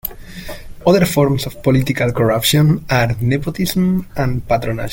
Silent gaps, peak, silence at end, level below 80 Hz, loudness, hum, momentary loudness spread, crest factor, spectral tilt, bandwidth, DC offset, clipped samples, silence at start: none; -2 dBFS; 0 s; -34 dBFS; -16 LUFS; none; 11 LU; 14 dB; -5.5 dB/octave; 17 kHz; under 0.1%; under 0.1%; 0.05 s